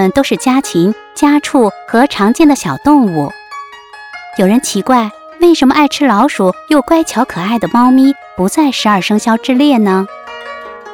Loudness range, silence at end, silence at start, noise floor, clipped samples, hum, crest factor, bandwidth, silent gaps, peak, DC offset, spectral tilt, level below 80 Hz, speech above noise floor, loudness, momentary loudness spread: 2 LU; 0 s; 0 s; -33 dBFS; under 0.1%; none; 10 dB; 18 kHz; none; 0 dBFS; under 0.1%; -5 dB/octave; -46 dBFS; 22 dB; -11 LUFS; 17 LU